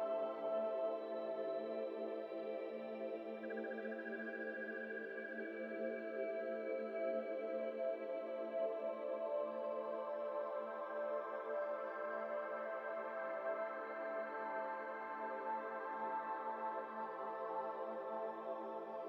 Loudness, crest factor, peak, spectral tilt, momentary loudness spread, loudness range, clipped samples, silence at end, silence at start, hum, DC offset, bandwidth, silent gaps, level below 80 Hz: -44 LUFS; 14 dB; -30 dBFS; -3 dB/octave; 4 LU; 3 LU; under 0.1%; 0 s; 0 s; none; under 0.1%; 5.8 kHz; none; under -90 dBFS